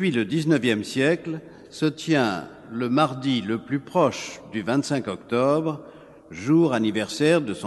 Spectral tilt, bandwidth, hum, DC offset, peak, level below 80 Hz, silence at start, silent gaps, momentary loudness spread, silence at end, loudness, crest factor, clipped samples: -6 dB/octave; 12 kHz; none; under 0.1%; -6 dBFS; -64 dBFS; 0 s; none; 12 LU; 0 s; -23 LUFS; 18 dB; under 0.1%